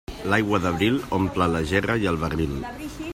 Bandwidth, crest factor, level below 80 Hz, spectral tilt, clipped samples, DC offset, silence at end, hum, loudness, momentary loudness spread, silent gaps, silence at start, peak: 16 kHz; 18 dB; -42 dBFS; -6 dB/octave; under 0.1%; under 0.1%; 0 s; none; -23 LUFS; 8 LU; none; 0.1 s; -6 dBFS